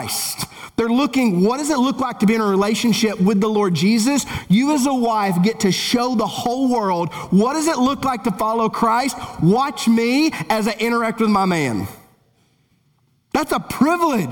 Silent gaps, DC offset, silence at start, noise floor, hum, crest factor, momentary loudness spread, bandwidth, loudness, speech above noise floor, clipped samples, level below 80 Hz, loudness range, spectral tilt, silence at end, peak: none; under 0.1%; 0 s; -61 dBFS; none; 14 dB; 5 LU; 19.5 kHz; -18 LUFS; 44 dB; under 0.1%; -50 dBFS; 4 LU; -5 dB/octave; 0 s; -4 dBFS